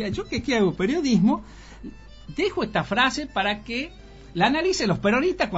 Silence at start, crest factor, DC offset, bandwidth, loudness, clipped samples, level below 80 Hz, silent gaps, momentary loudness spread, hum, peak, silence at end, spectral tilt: 0 s; 20 dB; under 0.1%; 8 kHz; -23 LUFS; under 0.1%; -46 dBFS; none; 15 LU; none; -4 dBFS; 0 s; -4 dB/octave